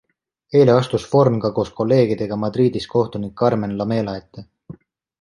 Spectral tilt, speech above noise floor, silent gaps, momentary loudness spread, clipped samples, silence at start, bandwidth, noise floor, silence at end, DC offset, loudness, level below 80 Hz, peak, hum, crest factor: -8 dB/octave; 24 dB; none; 8 LU; under 0.1%; 0.5 s; 11.5 kHz; -42 dBFS; 0.5 s; under 0.1%; -19 LUFS; -52 dBFS; -2 dBFS; none; 18 dB